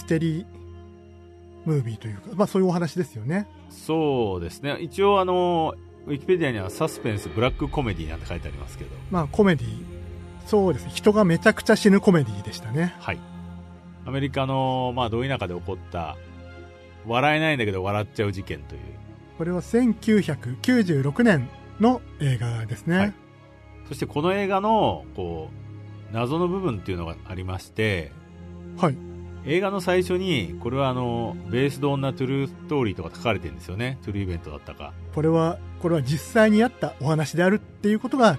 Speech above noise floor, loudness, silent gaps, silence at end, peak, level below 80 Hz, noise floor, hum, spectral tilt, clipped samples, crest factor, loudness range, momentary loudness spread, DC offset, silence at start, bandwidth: 24 dB; -24 LUFS; none; 0 s; -4 dBFS; -46 dBFS; -48 dBFS; none; -6.5 dB/octave; under 0.1%; 20 dB; 6 LU; 19 LU; under 0.1%; 0 s; 13.5 kHz